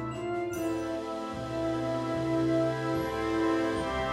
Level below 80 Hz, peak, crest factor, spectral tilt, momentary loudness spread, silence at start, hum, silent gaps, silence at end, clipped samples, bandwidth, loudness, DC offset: -50 dBFS; -18 dBFS; 12 dB; -6.5 dB/octave; 7 LU; 0 s; none; none; 0 s; under 0.1%; 14.5 kHz; -31 LUFS; under 0.1%